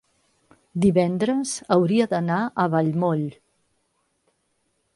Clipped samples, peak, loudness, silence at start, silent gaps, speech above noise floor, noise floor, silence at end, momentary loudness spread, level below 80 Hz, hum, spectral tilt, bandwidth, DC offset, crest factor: under 0.1%; -4 dBFS; -22 LUFS; 0.75 s; none; 50 dB; -71 dBFS; 1.65 s; 7 LU; -58 dBFS; none; -6.5 dB/octave; 11.5 kHz; under 0.1%; 20 dB